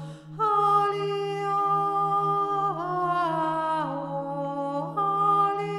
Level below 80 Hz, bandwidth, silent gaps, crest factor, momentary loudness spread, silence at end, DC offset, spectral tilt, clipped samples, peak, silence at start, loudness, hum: -70 dBFS; 12 kHz; none; 14 dB; 8 LU; 0 s; under 0.1%; -6.5 dB/octave; under 0.1%; -12 dBFS; 0 s; -25 LUFS; none